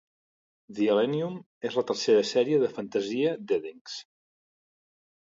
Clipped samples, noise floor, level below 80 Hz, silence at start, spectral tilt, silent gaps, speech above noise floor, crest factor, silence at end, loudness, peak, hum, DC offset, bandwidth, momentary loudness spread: under 0.1%; under -90 dBFS; -78 dBFS; 0.7 s; -5 dB/octave; 1.46-1.61 s, 3.81-3.85 s; over 63 dB; 16 dB; 1.2 s; -27 LUFS; -12 dBFS; none; under 0.1%; 7.8 kHz; 16 LU